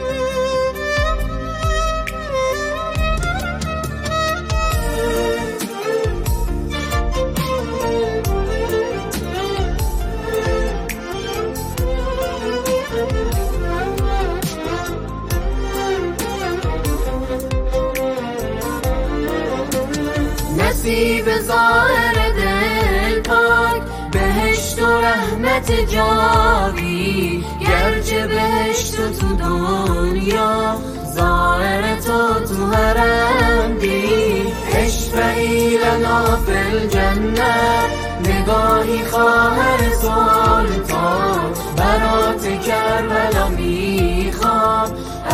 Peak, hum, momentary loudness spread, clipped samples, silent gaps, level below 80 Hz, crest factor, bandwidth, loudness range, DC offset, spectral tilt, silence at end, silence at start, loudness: -2 dBFS; none; 8 LU; under 0.1%; none; -24 dBFS; 16 dB; 15.5 kHz; 6 LU; under 0.1%; -5 dB/octave; 0 s; 0 s; -18 LUFS